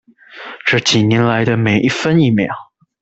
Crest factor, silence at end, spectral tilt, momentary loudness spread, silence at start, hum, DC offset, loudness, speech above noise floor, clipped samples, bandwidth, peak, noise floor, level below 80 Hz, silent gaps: 14 dB; 0.4 s; -5.5 dB/octave; 14 LU; 0.35 s; none; under 0.1%; -14 LUFS; 21 dB; under 0.1%; 8.2 kHz; -2 dBFS; -35 dBFS; -50 dBFS; none